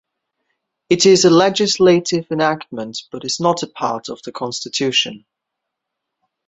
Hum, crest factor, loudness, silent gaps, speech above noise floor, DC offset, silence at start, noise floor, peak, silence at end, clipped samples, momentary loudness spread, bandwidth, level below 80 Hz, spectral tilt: none; 16 dB; -16 LUFS; none; 63 dB; under 0.1%; 0.9 s; -80 dBFS; -2 dBFS; 1.3 s; under 0.1%; 16 LU; 8.2 kHz; -60 dBFS; -4 dB/octave